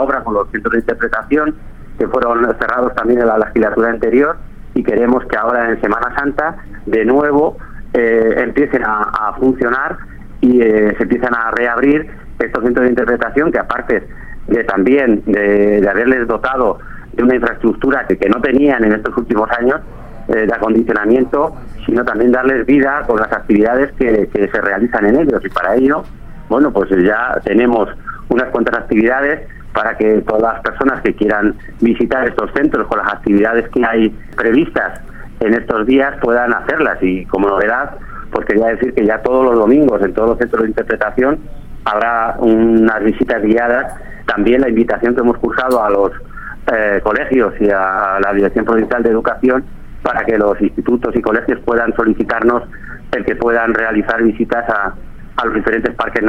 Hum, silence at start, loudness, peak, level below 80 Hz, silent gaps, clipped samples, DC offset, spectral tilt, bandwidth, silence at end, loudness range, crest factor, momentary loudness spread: none; 0 s; -14 LUFS; 0 dBFS; -32 dBFS; none; under 0.1%; under 0.1%; -8 dB/octave; 10.5 kHz; 0 s; 2 LU; 14 dB; 7 LU